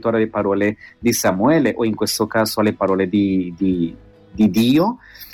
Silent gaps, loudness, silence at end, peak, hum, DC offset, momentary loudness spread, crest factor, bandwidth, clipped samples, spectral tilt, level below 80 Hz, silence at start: none; -18 LUFS; 0 s; -6 dBFS; none; under 0.1%; 7 LU; 12 dB; 17.5 kHz; under 0.1%; -5 dB/octave; -50 dBFS; 0 s